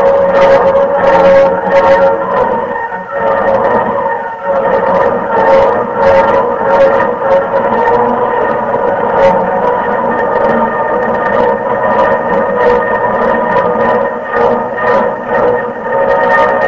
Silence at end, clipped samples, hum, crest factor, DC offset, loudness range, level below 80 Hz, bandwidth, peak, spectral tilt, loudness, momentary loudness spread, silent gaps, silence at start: 0 s; 0.2%; none; 10 dB; under 0.1%; 2 LU; -38 dBFS; 7.2 kHz; 0 dBFS; -7 dB/octave; -10 LUFS; 6 LU; none; 0 s